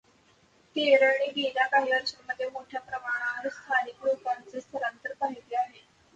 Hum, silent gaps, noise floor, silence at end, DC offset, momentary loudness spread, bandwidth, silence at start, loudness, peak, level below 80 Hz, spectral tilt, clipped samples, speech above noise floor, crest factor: none; none; -63 dBFS; 0.45 s; under 0.1%; 13 LU; 8 kHz; 0.75 s; -28 LUFS; -8 dBFS; -76 dBFS; -2.5 dB/octave; under 0.1%; 34 dB; 20 dB